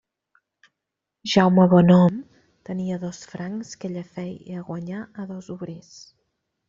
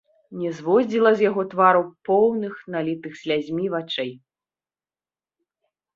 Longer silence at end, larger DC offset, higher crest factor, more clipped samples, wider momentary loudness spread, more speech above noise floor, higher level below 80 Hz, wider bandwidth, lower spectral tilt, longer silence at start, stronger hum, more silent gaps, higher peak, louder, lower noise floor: second, 0.9 s vs 1.8 s; neither; about the same, 20 dB vs 20 dB; neither; first, 20 LU vs 12 LU; second, 62 dB vs over 69 dB; first, -60 dBFS vs -68 dBFS; about the same, 7.6 kHz vs 7.4 kHz; about the same, -6.5 dB/octave vs -6.5 dB/octave; first, 1.25 s vs 0.3 s; neither; neither; about the same, -2 dBFS vs -2 dBFS; about the same, -21 LUFS vs -22 LUFS; second, -84 dBFS vs under -90 dBFS